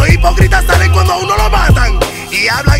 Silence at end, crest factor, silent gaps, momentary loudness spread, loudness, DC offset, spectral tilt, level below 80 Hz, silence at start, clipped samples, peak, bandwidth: 0 s; 8 dB; none; 4 LU; -10 LUFS; under 0.1%; -5 dB/octave; -14 dBFS; 0 s; 0.4%; 0 dBFS; 16 kHz